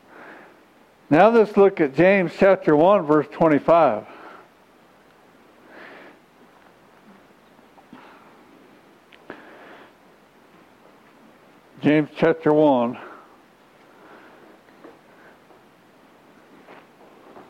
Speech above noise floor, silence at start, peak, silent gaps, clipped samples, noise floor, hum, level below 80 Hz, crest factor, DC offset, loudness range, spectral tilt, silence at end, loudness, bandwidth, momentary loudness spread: 37 dB; 1.1 s; -2 dBFS; none; under 0.1%; -54 dBFS; none; -62 dBFS; 22 dB; under 0.1%; 10 LU; -8 dB/octave; 4.4 s; -18 LUFS; 8.8 kHz; 27 LU